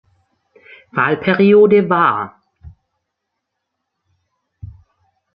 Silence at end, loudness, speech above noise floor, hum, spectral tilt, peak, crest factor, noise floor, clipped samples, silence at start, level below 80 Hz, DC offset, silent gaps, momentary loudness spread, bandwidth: 0.7 s; -13 LUFS; 64 dB; none; -10.5 dB/octave; -2 dBFS; 16 dB; -76 dBFS; under 0.1%; 0.95 s; -52 dBFS; under 0.1%; none; 14 LU; 5.2 kHz